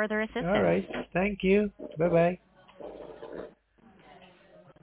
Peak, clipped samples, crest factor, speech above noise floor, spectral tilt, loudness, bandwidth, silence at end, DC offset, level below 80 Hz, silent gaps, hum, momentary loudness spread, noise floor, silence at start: -12 dBFS; under 0.1%; 18 dB; 33 dB; -10.5 dB/octave; -28 LUFS; 4 kHz; 0.55 s; under 0.1%; -54 dBFS; none; none; 20 LU; -60 dBFS; 0 s